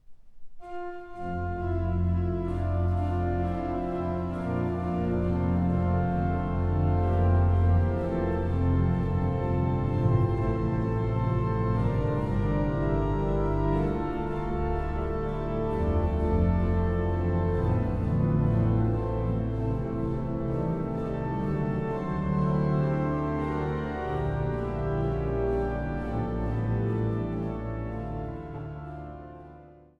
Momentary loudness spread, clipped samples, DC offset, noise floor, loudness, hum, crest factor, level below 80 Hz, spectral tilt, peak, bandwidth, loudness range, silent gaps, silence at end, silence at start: 7 LU; under 0.1%; under 0.1%; -50 dBFS; -28 LUFS; none; 14 dB; -36 dBFS; -10.5 dB/octave; -12 dBFS; 4.7 kHz; 4 LU; none; 0.25 s; 0.1 s